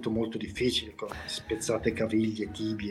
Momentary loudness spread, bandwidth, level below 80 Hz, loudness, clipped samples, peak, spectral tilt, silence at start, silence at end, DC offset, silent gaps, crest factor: 7 LU; 13 kHz; -54 dBFS; -31 LUFS; under 0.1%; -12 dBFS; -4.5 dB/octave; 0 s; 0 s; under 0.1%; none; 18 dB